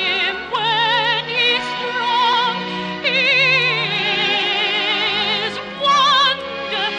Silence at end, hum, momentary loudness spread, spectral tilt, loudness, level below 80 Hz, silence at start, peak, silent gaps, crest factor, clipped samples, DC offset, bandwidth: 0 s; none; 8 LU; -2.5 dB/octave; -16 LUFS; -58 dBFS; 0 s; -4 dBFS; none; 14 dB; under 0.1%; under 0.1%; 10 kHz